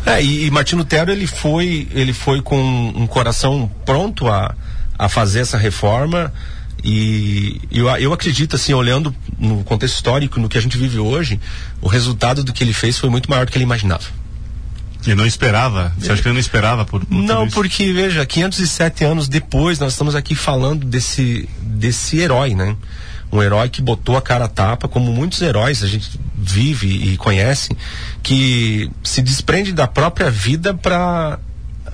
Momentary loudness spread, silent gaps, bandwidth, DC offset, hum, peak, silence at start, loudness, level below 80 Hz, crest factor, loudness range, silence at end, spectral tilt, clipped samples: 8 LU; none; 10.5 kHz; 2%; none; -2 dBFS; 0 s; -16 LUFS; -28 dBFS; 14 dB; 2 LU; 0 s; -5 dB/octave; under 0.1%